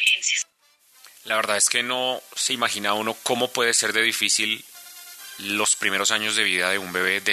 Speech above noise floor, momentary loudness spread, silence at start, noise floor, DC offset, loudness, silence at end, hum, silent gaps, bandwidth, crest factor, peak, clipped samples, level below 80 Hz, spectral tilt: 37 dB; 15 LU; 0 s; -60 dBFS; under 0.1%; -21 LUFS; 0 s; none; none; 14 kHz; 22 dB; -2 dBFS; under 0.1%; -76 dBFS; 0 dB/octave